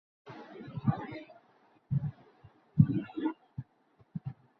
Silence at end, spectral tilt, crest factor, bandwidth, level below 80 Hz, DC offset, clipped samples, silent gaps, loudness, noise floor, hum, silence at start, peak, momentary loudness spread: 0.25 s; -9.5 dB/octave; 28 dB; 5 kHz; -60 dBFS; under 0.1%; under 0.1%; none; -34 LUFS; -67 dBFS; none; 0.25 s; -8 dBFS; 21 LU